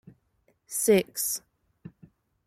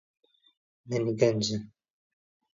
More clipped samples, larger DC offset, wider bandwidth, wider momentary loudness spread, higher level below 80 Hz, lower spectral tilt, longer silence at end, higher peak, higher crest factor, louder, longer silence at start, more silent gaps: neither; neither; first, 16.5 kHz vs 7.8 kHz; about the same, 11 LU vs 9 LU; about the same, -66 dBFS vs -68 dBFS; second, -3.5 dB/octave vs -5.5 dB/octave; second, 0.6 s vs 0.9 s; about the same, -10 dBFS vs -8 dBFS; about the same, 20 dB vs 24 dB; first, -26 LUFS vs -29 LUFS; second, 0.7 s vs 0.85 s; neither